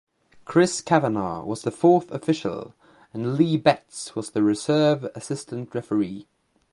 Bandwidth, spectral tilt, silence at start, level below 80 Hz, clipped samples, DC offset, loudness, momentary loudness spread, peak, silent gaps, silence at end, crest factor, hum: 11.5 kHz; -6 dB/octave; 0.5 s; -62 dBFS; under 0.1%; under 0.1%; -23 LUFS; 12 LU; -2 dBFS; none; 0.5 s; 20 dB; none